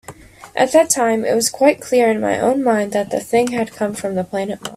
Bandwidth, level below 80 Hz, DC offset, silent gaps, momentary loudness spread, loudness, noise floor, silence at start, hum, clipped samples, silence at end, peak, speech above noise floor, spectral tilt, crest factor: 16 kHz; -56 dBFS; under 0.1%; none; 8 LU; -17 LUFS; -39 dBFS; 0.1 s; none; under 0.1%; 0 s; 0 dBFS; 22 dB; -3.5 dB/octave; 18 dB